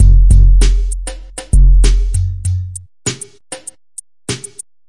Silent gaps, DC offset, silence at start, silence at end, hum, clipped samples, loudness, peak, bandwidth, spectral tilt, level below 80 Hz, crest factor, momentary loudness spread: none; under 0.1%; 0 s; 0 s; none; under 0.1%; -15 LUFS; 0 dBFS; 11.5 kHz; -5 dB/octave; -12 dBFS; 12 dB; 19 LU